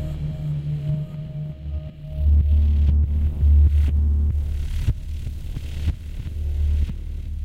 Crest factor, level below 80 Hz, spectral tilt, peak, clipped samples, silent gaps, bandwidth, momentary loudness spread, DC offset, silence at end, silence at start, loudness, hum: 12 dB; -22 dBFS; -8.5 dB/octave; -8 dBFS; under 0.1%; none; 4.2 kHz; 14 LU; under 0.1%; 0 s; 0 s; -23 LUFS; none